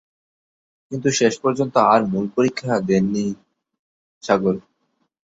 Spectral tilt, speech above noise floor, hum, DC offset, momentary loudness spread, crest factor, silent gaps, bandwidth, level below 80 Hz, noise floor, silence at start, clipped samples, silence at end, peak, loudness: -5.5 dB/octave; 51 dB; none; under 0.1%; 13 LU; 20 dB; 3.79-4.21 s; 8 kHz; -60 dBFS; -70 dBFS; 0.9 s; under 0.1%; 0.7 s; -2 dBFS; -20 LUFS